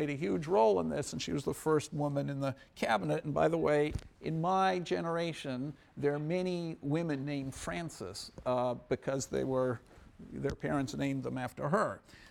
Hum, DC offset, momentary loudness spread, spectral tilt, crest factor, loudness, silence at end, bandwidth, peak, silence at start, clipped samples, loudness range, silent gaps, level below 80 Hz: none; under 0.1%; 9 LU; -6 dB/octave; 18 dB; -34 LUFS; 0 s; 17 kHz; -16 dBFS; 0 s; under 0.1%; 4 LU; none; -58 dBFS